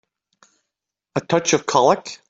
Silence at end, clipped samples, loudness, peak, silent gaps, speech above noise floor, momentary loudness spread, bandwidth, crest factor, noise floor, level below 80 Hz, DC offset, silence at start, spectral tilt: 0.15 s; under 0.1%; -19 LUFS; -2 dBFS; none; 64 dB; 12 LU; 8.4 kHz; 20 dB; -83 dBFS; -64 dBFS; under 0.1%; 1.15 s; -3.5 dB/octave